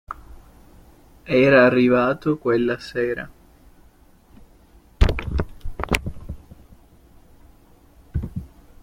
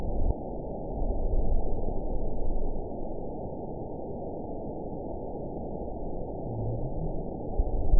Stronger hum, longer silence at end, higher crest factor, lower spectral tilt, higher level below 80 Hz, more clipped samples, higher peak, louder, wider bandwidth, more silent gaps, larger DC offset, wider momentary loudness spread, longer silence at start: neither; first, 0.35 s vs 0 s; about the same, 22 dB vs 18 dB; second, -6.5 dB/octave vs -16.5 dB/octave; about the same, -32 dBFS vs -32 dBFS; neither; first, -2 dBFS vs -10 dBFS; first, -20 LUFS vs -36 LUFS; first, 16.5 kHz vs 1 kHz; neither; second, under 0.1% vs 0.8%; first, 24 LU vs 5 LU; about the same, 0.1 s vs 0 s